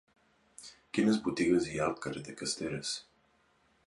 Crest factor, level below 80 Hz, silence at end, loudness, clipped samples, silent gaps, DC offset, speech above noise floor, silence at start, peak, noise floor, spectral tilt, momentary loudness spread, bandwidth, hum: 20 dB; -64 dBFS; 0.85 s; -33 LUFS; under 0.1%; none; under 0.1%; 38 dB; 0.6 s; -16 dBFS; -70 dBFS; -4.5 dB/octave; 16 LU; 11.5 kHz; none